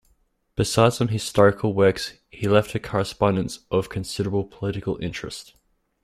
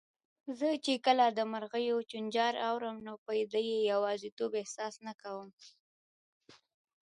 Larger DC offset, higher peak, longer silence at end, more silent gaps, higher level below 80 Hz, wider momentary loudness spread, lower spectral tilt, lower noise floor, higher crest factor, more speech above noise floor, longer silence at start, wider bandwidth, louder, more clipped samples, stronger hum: neither; first, -2 dBFS vs -14 dBFS; about the same, 0.6 s vs 0.5 s; second, none vs 3.18-3.26 s, 4.32-4.37 s, 5.14-5.18 s, 5.53-5.57 s, 5.80-6.41 s; first, -50 dBFS vs -86 dBFS; second, 12 LU vs 16 LU; first, -5.5 dB/octave vs -3.5 dB/octave; second, -65 dBFS vs under -90 dBFS; about the same, 22 dB vs 20 dB; second, 43 dB vs over 56 dB; first, 0.6 s vs 0.45 s; first, 14.5 kHz vs 11 kHz; first, -23 LUFS vs -34 LUFS; neither; neither